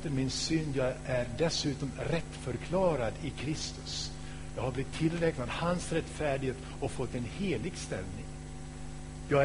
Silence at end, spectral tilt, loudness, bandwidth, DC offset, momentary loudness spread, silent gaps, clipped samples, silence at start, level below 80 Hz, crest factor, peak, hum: 0 s; -5 dB/octave; -34 LUFS; 10.5 kHz; 0.4%; 13 LU; none; under 0.1%; 0 s; -46 dBFS; 20 dB; -14 dBFS; none